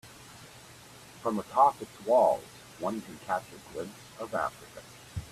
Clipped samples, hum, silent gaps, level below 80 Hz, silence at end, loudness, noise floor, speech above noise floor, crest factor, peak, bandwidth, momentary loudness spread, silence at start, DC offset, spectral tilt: under 0.1%; none; none; -62 dBFS; 0 s; -30 LUFS; -51 dBFS; 21 dB; 22 dB; -10 dBFS; 14.5 kHz; 24 LU; 0.05 s; under 0.1%; -5 dB/octave